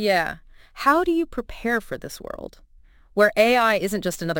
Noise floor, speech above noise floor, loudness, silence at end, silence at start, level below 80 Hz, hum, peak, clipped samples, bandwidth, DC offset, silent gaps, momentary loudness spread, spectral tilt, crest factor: -52 dBFS; 30 dB; -21 LUFS; 0 s; 0 s; -46 dBFS; none; -4 dBFS; under 0.1%; 17 kHz; under 0.1%; none; 18 LU; -4.5 dB/octave; 20 dB